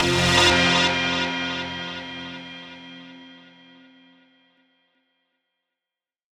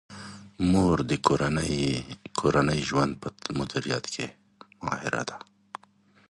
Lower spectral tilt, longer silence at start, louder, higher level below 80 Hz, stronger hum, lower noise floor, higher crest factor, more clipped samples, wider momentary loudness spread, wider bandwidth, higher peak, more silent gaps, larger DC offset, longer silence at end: second, -3 dB/octave vs -5.5 dB/octave; about the same, 0 s vs 0.1 s; first, -20 LUFS vs -27 LUFS; about the same, -48 dBFS vs -48 dBFS; neither; first, -89 dBFS vs -61 dBFS; second, 20 dB vs 26 dB; neither; first, 25 LU vs 20 LU; first, 17.5 kHz vs 11.5 kHz; second, -6 dBFS vs -2 dBFS; neither; neither; first, 3 s vs 0.9 s